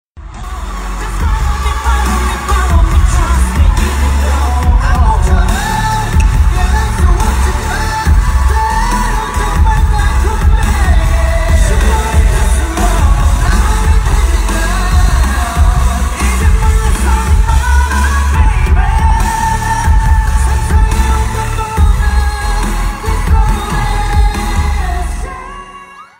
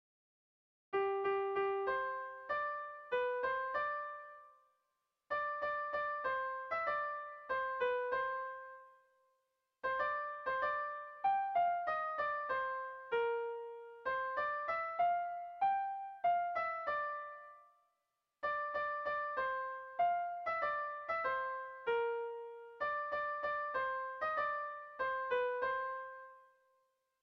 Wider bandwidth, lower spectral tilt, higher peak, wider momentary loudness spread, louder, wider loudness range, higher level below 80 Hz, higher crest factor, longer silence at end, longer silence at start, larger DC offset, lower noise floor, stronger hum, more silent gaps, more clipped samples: first, 16.5 kHz vs 6.2 kHz; about the same, -5 dB/octave vs -5 dB/octave; first, 0 dBFS vs -24 dBFS; second, 5 LU vs 9 LU; first, -13 LUFS vs -38 LUFS; about the same, 2 LU vs 3 LU; first, -12 dBFS vs -76 dBFS; about the same, 10 dB vs 14 dB; second, 0.15 s vs 0.8 s; second, 0.15 s vs 0.9 s; neither; second, -33 dBFS vs -86 dBFS; neither; neither; neither